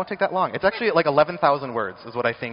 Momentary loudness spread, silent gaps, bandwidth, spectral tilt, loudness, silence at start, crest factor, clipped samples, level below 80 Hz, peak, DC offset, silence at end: 9 LU; none; 5.6 kHz; -3 dB/octave; -22 LUFS; 0 s; 20 dB; under 0.1%; -58 dBFS; -2 dBFS; under 0.1%; 0 s